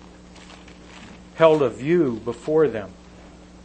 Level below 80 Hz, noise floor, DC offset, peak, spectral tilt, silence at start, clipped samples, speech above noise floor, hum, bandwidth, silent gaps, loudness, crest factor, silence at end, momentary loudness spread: -52 dBFS; -45 dBFS; under 0.1%; -2 dBFS; -7 dB/octave; 0.35 s; under 0.1%; 25 dB; none; 8.8 kHz; none; -20 LUFS; 22 dB; 0.7 s; 25 LU